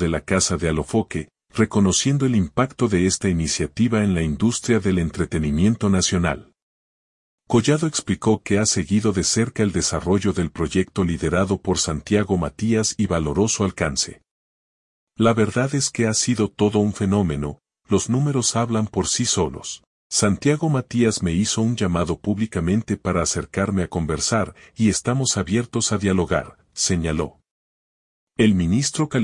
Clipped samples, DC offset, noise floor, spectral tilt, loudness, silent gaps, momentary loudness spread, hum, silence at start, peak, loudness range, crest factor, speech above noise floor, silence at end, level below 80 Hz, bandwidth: under 0.1%; under 0.1%; under -90 dBFS; -4.5 dB/octave; -21 LUFS; 6.62-7.38 s, 14.31-15.07 s, 19.87-20.10 s, 27.51-28.27 s; 5 LU; none; 0 s; -4 dBFS; 2 LU; 18 dB; over 70 dB; 0 s; -44 dBFS; 11 kHz